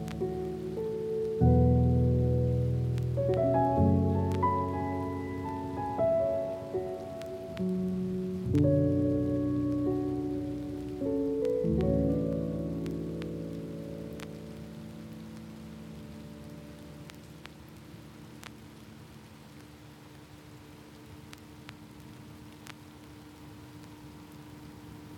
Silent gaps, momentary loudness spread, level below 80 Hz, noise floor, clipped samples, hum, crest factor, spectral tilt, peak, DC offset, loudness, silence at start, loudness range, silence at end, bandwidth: none; 24 LU; -46 dBFS; -51 dBFS; under 0.1%; none; 20 dB; -9 dB/octave; -12 dBFS; under 0.1%; -30 LUFS; 0 s; 22 LU; 0 s; 15 kHz